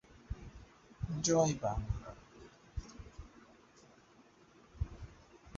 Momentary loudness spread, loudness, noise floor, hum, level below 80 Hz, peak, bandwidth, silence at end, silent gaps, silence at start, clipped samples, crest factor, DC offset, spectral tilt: 27 LU; -38 LUFS; -64 dBFS; none; -50 dBFS; -18 dBFS; 7.6 kHz; 0 s; none; 0.1 s; under 0.1%; 24 dB; under 0.1%; -6.5 dB/octave